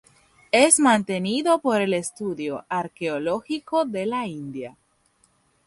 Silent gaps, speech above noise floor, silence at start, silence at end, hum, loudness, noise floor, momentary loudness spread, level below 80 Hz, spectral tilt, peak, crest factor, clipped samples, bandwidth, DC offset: none; 42 dB; 0.55 s; 0.95 s; none; -22 LUFS; -64 dBFS; 15 LU; -66 dBFS; -3.5 dB/octave; -2 dBFS; 22 dB; under 0.1%; 11.5 kHz; under 0.1%